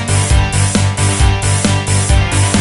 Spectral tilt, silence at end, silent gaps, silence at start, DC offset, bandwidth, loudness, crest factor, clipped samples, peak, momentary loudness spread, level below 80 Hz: -4 dB/octave; 0 s; none; 0 s; 0.2%; 11.5 kHz; -13 LUFS; 12 dB; under 0.1%; 0 dBFS; 1 LU; -18 dBFS